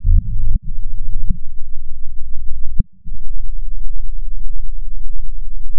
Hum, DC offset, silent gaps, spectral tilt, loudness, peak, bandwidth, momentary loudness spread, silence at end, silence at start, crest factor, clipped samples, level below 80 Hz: none; under 0.1%; none; -12.5 dB/octave; -28 LUFS; 0 dBFS; 0.2 kHz; 11 LU; 0 s; 0 s; 8 dB; under 0.1%; -20 dBFS